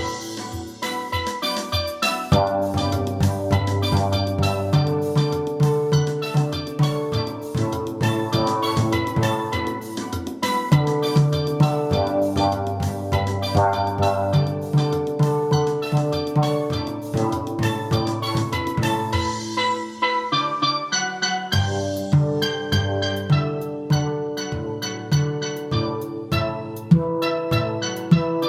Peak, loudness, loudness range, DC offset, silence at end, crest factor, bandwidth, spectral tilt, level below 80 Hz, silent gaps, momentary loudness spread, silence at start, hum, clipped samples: -2 dBFS; -22 LUFS; 2 LU; under 0.1%; 0 s; 20 dB; 15.5 kHz; -6 dB/octave; -48 dBFS; none; 7 LU; 0 s; none; under 0.1%